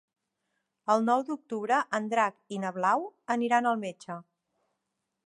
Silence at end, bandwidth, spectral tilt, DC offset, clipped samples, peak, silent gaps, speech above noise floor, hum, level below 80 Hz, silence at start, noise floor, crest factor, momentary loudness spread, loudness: 1.05 s; 11 kHz; -5 dB/octave; under 0.1%; under 0.1%; -10 dBFS; none; 55 dB; none; -86 dBFS; 0.85 s; -83 dBFS; 20 dB; 13 LU; -29 LUFS